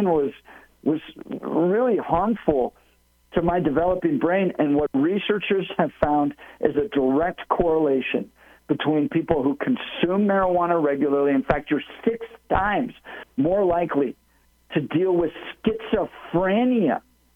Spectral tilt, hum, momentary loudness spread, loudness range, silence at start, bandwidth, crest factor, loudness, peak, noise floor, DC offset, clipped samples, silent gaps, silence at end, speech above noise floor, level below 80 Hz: -8.5 dB/octave; none; 8 LU; 2 LU; 0 s; 4.1 kHz; 20 dB; -23 LUFS; -4 dBFS; -61 dBFS; under 0.1%; under 0.1%; none; 0.35 s; 39 dB; -46 dBFS